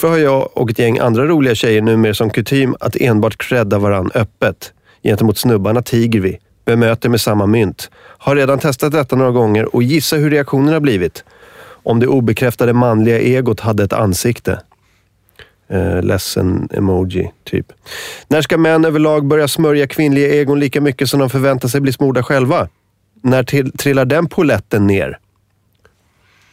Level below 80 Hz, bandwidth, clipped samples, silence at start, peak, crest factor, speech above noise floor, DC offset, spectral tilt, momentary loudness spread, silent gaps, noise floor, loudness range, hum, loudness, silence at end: -44 dBFS; 16 kHz; under 0.1%; 0 s; -4 dBFS; 10 dB; 45 dB; under 0.1%; -6 dB/octave; 9 LU; none; -58 dBFS; 4 LU; none; -14 LUFS; 1.35 s